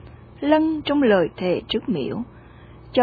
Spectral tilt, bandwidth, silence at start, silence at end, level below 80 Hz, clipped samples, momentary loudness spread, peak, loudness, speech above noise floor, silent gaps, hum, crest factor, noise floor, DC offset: -8.5 dB/octave; 4.9 kHz; 0 s; 0 s; -50 dBFS; under 0.1%; 11 LU; -6 dBFS; -22 LUFS; 24 dB; none; none; 16 dB; -44 dBFS; under 0.1%